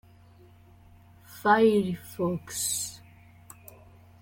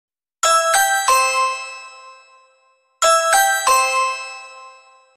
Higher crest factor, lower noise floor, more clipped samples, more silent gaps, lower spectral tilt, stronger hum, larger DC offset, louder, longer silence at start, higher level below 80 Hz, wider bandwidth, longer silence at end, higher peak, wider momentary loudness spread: first, 22 dB vs 16 dB; second, -54 dBFS vs -59 dBFS; neither; neither; first, -4 dB/octave vs 3 dB/octave; neither; neither; second, -26 LUFS vs -16 LUFS; first, 1.3 s vs 0.45 s; about the same, -62 dBFS vs -62 dBFS; about the same, 17 kHz vs 16 kHz; first, 1.25 s vs 0.5 s; second, -8 dBFS vs -2 dBFS; first, 27 LU vs 19 LU